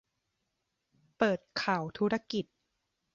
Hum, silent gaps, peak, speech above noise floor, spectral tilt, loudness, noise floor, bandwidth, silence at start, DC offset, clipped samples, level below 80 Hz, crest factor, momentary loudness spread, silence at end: none; none; -12 dBFS; 51 dB; -5.5 dB/octave; -32 LUFS; -83 dBFS; 7.6 kHz; 1.2 s; under 0.1%; under 0.1%; -70 dBFS; 22 dB; 7 LU; 0.7 s